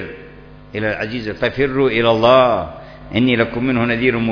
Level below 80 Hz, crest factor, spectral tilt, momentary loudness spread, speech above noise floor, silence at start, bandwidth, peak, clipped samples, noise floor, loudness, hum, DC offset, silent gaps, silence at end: -42 dBFS; 16 dB; -7.5 dB/octave; 18 LU; 23 dB; 0 s; 5.4 kHz; 0 dBFS; under 0.1%; -39 dBFS; -16 LUFS; none; under 0.1%; none; 0 s